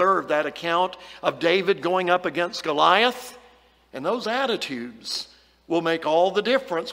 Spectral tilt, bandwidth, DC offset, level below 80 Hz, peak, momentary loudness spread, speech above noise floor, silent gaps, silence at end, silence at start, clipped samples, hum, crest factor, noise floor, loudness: -4 dB/octave; 16 kHz; under 0.1%; -66 dBFS; -2 dBFS; 11 LU; 32 dB; none; 0 s; 0 s; under 0.1%; none; 20 dB; -55 dBFS; -23 LUFS